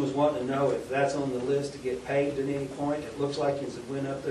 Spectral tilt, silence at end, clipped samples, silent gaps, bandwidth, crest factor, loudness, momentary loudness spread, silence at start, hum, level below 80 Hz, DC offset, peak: -6 dB/octave; 0 s; under 0.1%; none; 12.5 kHz; 16 dB; -30 LUFS; 7 LU; 0 s; none; -58 dBFS; under 0.1%; -12 dBFS